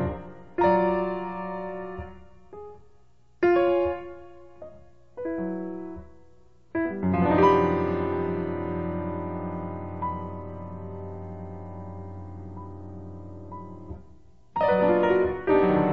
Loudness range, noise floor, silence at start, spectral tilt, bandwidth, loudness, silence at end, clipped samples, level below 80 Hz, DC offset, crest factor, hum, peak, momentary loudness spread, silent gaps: 14 LU; -61 dBFS; 0 s; -9 dB/octave; 6.6 kHz; -26 LUFS; 0 s; under 0.1%; -52 dBFS; 0.4%; 20 dB; none; -8 dBFS; 22 LU; none